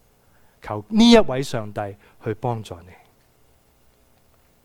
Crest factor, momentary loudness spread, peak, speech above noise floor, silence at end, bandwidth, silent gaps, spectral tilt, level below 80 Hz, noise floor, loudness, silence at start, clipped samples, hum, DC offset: 22 dB; 23 LU; -2 dBFS; 38 dB; 1.85 s; 13 kHz; none; -5.5 dB/octave; -46 dBFS; -58 dBFS; -20 LUFS; 0.65 s; under 0.1%; none; under 0.1%